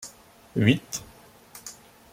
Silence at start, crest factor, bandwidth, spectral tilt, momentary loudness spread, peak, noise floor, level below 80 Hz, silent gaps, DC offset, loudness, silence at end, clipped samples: 0 s; 24 dB; 16.5 kHz; -5 dB/octave; 21 LU; -6 dBFS; -50 dBFS; -60 dBFS; none; under 0.1%; -26 LUFS; 0.4 s; under 0.1%